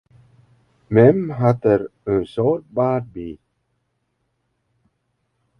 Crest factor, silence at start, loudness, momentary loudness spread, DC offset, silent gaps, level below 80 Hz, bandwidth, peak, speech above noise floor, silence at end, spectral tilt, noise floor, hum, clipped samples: 20 dB; 0.9 s; -18 LUFS; 14 LU; under 0.1%; none; -52 dBFS; 6 kHz; 0 dBFS; 53 dB; 2.25 s; -10.5 dB/octave; -71 dBFS; none; under 0.1%